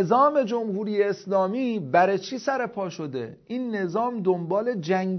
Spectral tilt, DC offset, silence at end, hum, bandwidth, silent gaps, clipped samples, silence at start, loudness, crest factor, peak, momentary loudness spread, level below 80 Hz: -6.5 dB/octave; under 0.1%; 0 s; none; 6.4 kHz; none; under 0.1%; 0 s; -25 LUFS; 18 dB; -6 dBFS; 11 LU; -72 dBFS